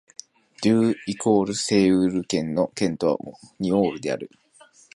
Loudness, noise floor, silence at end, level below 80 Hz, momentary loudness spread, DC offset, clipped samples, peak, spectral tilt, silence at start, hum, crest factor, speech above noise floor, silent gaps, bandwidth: -23 LUFS; -53 dBFS; 0.7 s; -58 dBFS; 12 LU; under 0.1%; under 0.1%; -6 dBFS; -5.5 dB/octave; 0.6 s; none; 16 dB; 31 dB; none; 11.5 kHz